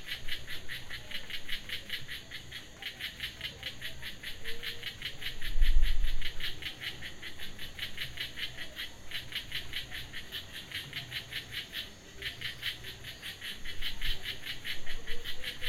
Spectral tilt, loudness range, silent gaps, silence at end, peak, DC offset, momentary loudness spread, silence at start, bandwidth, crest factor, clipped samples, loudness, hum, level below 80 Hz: -2.5 dB/octave; 3 LU; none; 0 s; -12 dBFS; under 0.1%; 6 LU; 0 s; 15.5 kHz; 20 dB; under 0.1%; -39 LUFS; none; -36 dBFS